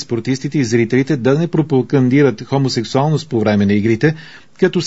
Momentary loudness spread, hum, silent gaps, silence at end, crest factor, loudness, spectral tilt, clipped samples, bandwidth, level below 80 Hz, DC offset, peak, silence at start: 5 LU; none; none; 0 s; 14 dB; -15 LUFS; -7 dB/octave; under 0.1%; 8 kHz; -54 dBFS; 0.7%; 0 dBFS; 0 s